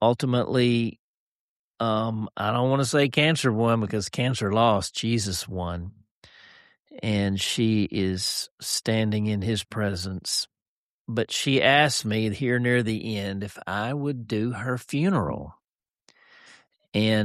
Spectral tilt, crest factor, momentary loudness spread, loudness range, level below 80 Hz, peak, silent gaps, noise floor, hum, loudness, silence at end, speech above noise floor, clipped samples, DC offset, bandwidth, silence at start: -5 dB/octave; 18 dB; 10 LU; 5 LU; -56 dBFS; -6 dBFS; 0.99-1.74 s, 6.11-6.22 s, 6.79-6.85 s, 8.51-8.58 s, 10.62-11.05 s, 15.64-15.79 s, 15.90-15.94 s, 16.88-16.92 s; under -90 dBFS; none; -25 LUFS; 0 s; over 66 dB; under 0.1%; under 0.1%; 14 kHz; 0 s